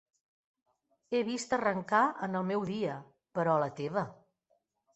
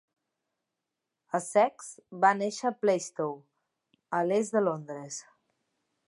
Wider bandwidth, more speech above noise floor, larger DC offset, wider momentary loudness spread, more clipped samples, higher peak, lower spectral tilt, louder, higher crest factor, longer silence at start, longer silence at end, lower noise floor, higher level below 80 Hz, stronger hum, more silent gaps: second, 8.4 kHz vs 11.5 kHz; second, 45 dB vs 58 dB; neither; second, 9 LU vs 16 LU; neither; second, -14 dBFS vs -8 dBFS; about the same, -5.5 dB/octave vs -4.5 dB/octave; second, -32 LUFS vs -29 LUFS; about the same, 20 dB vs 22 dB; second, 1.1 s vs 1.35 s; about the same, 0.8 s vs 0.85 s; second, -77 dBFS vs -86 dBFS; first, -74 dBFS vs -86 dBFS; neither; neither